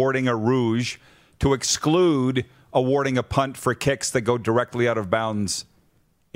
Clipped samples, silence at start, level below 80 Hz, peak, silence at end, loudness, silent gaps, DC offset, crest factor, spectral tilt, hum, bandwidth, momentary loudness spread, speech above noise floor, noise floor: under 0.1%; 0 s; -46 dBFS; -4 dBFS; 0.75 s; -22 LUFS; none; under 0.1%; 18 dB; -5 dB/octave; none; 16 kHz; 6 LU; 41 dB; -63 dBFS